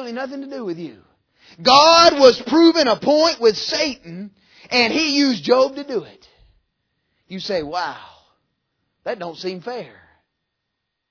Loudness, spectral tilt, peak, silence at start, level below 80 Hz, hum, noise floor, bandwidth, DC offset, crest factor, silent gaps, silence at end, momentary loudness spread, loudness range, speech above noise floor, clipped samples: -15 LUFS; -3 dB/octave; 0 dBFS; 0 s; -58 dBFS; none; -78 dBFS; 5.4 kHz; under 0.1%; 18 dB; none; 1.25 s; 21 LU; 16 LU; 60 dB; under 0.1%